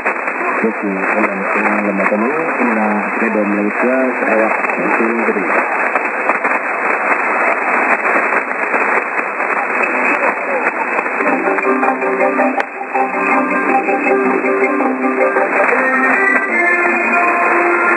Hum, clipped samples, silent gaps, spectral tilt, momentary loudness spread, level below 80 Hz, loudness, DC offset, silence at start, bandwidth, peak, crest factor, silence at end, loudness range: none; under 0.1%; none; -6.5 dB/octave; 4 LU; -70 dBFS; -14 LUFS; under 0.1%; 0 s; 10.5 kHz; 0 dBFS; 14 dB; 0 s; 2 LU